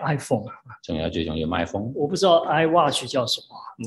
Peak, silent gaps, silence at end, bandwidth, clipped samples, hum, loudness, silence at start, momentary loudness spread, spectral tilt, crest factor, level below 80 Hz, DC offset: -6 dBFS; none; 0 s; 12.5 kHz; under 0.1%; none; -23 LUFS; 0 s; 12 LU; -5 dB/octave; 18 dB; -48 dBFS; under 0.1%